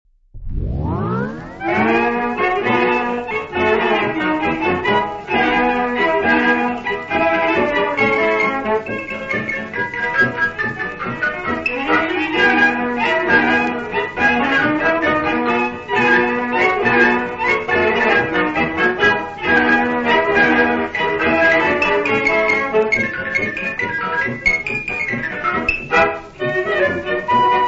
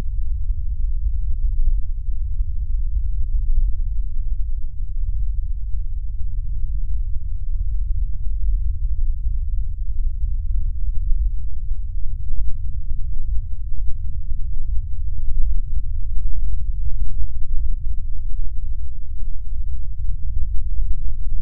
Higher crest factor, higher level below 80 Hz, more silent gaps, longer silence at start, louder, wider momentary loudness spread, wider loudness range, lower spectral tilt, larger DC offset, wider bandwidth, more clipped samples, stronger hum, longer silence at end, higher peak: about the same, 16 dB vs 12 dB; second, -40 dBFS vs -20 dBFS; neither; first, 0.35 s vs 0 s; first, -16 LUFS vs -28 LUFS; first, 8 LU vs 5 LU; about the same, 4 LU vs 3 LU; second, -5.5 dB/octave vs -12.5 dB/octave; neither; first, 8 kHz vs 0.2 kHz; neither; neither; about the same, 0 s vs 0 s; about the same, -2 dBFS vs -2 dBFS